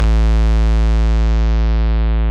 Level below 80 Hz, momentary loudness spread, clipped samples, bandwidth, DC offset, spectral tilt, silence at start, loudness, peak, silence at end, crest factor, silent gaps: -12 dBFS; 2 LU; under 0.1%; 6.4 kHz; under 0.1%; -7.5 dB/octave; 0 s; -16 LUFS; -6 dBFS; 0 s; 8 dB; none